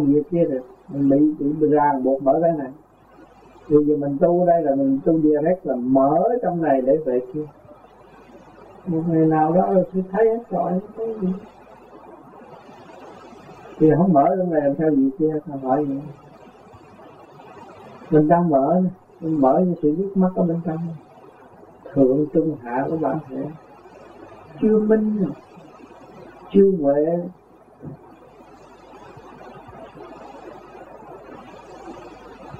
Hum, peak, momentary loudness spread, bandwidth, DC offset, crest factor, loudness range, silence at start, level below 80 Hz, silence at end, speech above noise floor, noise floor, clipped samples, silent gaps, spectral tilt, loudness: none; -4 dBFS; 24 LU; 4.8 kHz; under 0.1%; 18 dB; 10 LU; 0 s; -56 dBFS; 0 s; 30 dB; -49 dBFS; under 0.1%; none; -11 dB/octave; -20 LUFS